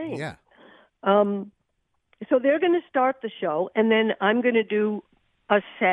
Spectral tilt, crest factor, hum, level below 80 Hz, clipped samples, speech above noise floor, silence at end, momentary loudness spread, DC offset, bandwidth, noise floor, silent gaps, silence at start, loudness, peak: -7 dB/octave; 18 dB; none; -70 dBFS; under 0.1%; 51 dB; 0 s; 12 LU; under 0.1%; 9.4 kHz; -74 dBFS; none; 0 s; -23 LUFS; -6 dBFS